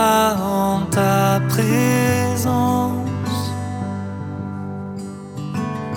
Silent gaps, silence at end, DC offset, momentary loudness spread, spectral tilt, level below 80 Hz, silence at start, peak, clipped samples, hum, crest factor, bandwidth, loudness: none; 0 s; under 0.1%; 12 LU; -5.5 dB/octave; -50 dBFS; 0 s; -4 dBFS; under 0.1%; none; 16 dB; 19 kHz; -20 LUFS